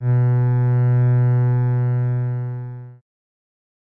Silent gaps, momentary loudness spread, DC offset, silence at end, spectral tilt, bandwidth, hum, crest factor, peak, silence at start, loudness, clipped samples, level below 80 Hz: none; 13 LU; under 0.1%; 1.05 s; -12.5 dB/octave; 2.5 kHz; none; 8 dB; -10 dBFS; 0 s; -19 LUFS; under 0.1%; -68 dBFS